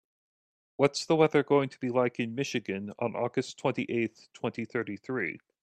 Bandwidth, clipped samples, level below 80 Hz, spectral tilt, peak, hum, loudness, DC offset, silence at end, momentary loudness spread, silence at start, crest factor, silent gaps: 11.5 kHz; under 0.1%; -74 dBFS; -5.5 dB/octave; -10 dBFS; none; -30 LUFS; under 0.1%; 0.25 s; 11 LU; 0.8 s; 22 dB; none